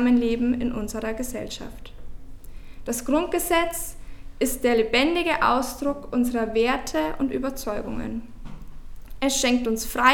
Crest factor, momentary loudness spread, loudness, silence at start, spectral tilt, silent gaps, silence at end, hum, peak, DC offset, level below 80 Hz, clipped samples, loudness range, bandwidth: 22 dB; 15 LU; -24 LUFS; 0 s; -3 dB/octave; none; 0 s; none; -2 dBFS; under 0.1%; -40 dBFS; under 0.1%; 5 LU; 19 kHz